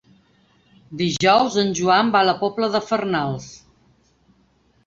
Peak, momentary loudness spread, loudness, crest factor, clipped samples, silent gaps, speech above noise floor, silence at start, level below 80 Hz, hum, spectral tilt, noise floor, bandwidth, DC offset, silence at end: -4 dBFS; 12 LU; -19 LUFS; 18 dB; under 0.1%; none; 41 dB; 0.9 s; -58 dBFS; none; -4.5 dB/octave; -60 dBFS; 7.8 kHz; under 0.1%; 1.3 s